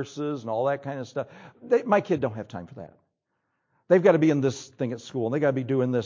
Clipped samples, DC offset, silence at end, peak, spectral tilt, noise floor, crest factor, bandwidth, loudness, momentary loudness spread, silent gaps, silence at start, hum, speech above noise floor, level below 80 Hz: under 0.1%; under 0.1%; 0 s; -6 dBFS; -7 dB/octave; -78 dBFS; 20 dB; 7.6 kHz; -25 LUFS; 18 LU; none; 0 s; none; 53 dB; -66 dBFS